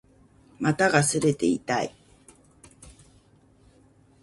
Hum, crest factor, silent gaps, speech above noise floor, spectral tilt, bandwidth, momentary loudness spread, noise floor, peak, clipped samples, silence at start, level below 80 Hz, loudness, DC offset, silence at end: none; 24 dB; none; 35 dB; -4.5 dB/octave; 11.5 kHz; 8 LU; -58 dBFS; -4 dBFS; under 0.1%; 0.6 s; -60 dBFS; -24 LUFS; under 0.1%; 1.3 s